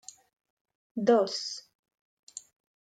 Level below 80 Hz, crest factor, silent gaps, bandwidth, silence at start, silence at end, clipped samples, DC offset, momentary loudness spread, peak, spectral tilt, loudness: -86 dBFS; 22 dB; 1.75-1.83 s, 2.01-2.27 s; 9.4 kHz; 0.95 s; 0.45 s; under 0.1%; under 0.1%; 22 LU; -10 dBFS; -4 dB/octave; -28 LUFS